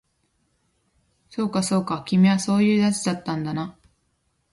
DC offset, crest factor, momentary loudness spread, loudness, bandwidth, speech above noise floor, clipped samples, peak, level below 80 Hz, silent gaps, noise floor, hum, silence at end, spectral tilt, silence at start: under 0.1%; 16 dB; 11 LU; -22 LUFS; 11.5 kHz; 49 dB; under 0.1%; -8 dBFS; -62 dBFS; none; -70 dBFS; none; 0.8 s; -5.5 dB/octave; 1.3 s